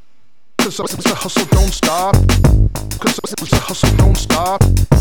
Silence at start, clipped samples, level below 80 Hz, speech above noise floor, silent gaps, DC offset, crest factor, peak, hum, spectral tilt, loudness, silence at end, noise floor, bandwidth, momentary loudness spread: 0.6 s; under 0.1%; -18 dBFS; 49 dB; none; 2%; 14 dB; 0 dBFS; none; -5 dB/octave; -15 LUFS; 0 s; -62 dBFS; 19 kHz; 7 LU